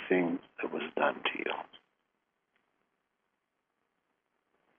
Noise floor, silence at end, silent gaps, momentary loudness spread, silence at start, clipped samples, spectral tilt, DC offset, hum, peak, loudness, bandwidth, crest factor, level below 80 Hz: -83 dBFS; 3 s; none; 10 LU; 0 s; under 0.1%; -2.5 dB/octave; under 0.1%; none; -14 dBFS; -34 LUFS; 3.8 kHz; 24 dB; -84 dBFS